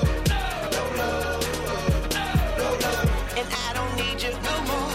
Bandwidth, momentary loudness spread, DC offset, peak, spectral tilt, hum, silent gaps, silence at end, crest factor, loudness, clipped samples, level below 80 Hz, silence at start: 16.5 kHz; 3 LU; under 0.1%; -10 dBFS; -4.5 dB/octave; none; none; 0 s; 14 dB; -25 LUFS; under 0.1%; -32 dBFS; 0 s